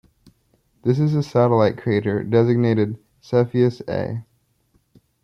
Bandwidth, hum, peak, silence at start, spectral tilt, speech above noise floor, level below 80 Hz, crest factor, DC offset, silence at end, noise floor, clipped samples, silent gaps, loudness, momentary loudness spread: 6.8 kHz; none; -4 dBFS; 0.85 s; -9 dB/octave; 45 dB; -58 dBFS; 16 dB; under 0.1%; 1 s; -64 dBFS; under 0.1%; none; -20 LUFS; 9 LU